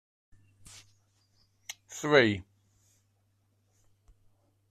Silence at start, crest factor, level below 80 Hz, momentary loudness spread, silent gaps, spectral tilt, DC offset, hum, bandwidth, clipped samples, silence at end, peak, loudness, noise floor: 1.7 s; 26 dB; -68 dBFS; 28 LU; none; -4.5 dB/octave; under 0.1%; none; 14.5 kHz; under 0.1%; 2.3 s; -8 dBFS; -26 LUFS; -72 dBFS